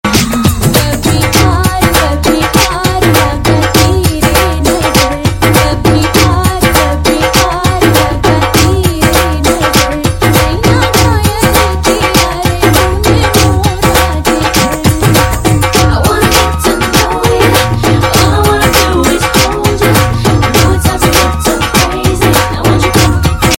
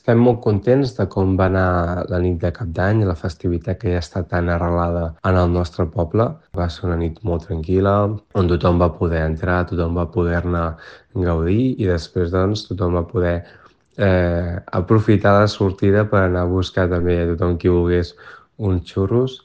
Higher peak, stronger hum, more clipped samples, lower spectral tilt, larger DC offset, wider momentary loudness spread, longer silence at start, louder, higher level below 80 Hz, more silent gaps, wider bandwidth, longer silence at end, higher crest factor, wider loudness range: about the same, 0 dBFS vs 0 dBFS; neither; first, 0.6% vs under 0.1%; second, -4.5 dB/octave vs -8.5 dB/octave; neither; second, 2 LU vs 7 LU; about the same, 0.05 s vs 0.05 s; first, -9 LUFS vs -19 LUFS; first, -20 dBFS vs -40 dBFS; neither; first, 17.5 kHz vs 7.8 kHz; about the same, 0 s vs 0.05 s; second, 8 dB vs 18 dB; about the same, 1 LU vs 3 LU